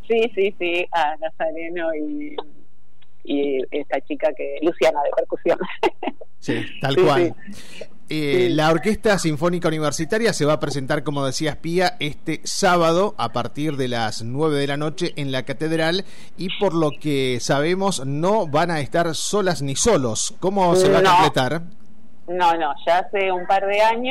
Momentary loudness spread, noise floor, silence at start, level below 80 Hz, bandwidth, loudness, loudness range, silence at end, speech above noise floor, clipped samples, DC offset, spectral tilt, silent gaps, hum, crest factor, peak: 10 LU; -60 dBFS; 0.1 s; -50 dBFS; 16 kHz; -21 LUFS; 5 LU; 0 s; 39 dB; under 0.1%; 4%; -4.5 dB/octave; none; none; 12 dB; -8 dBFS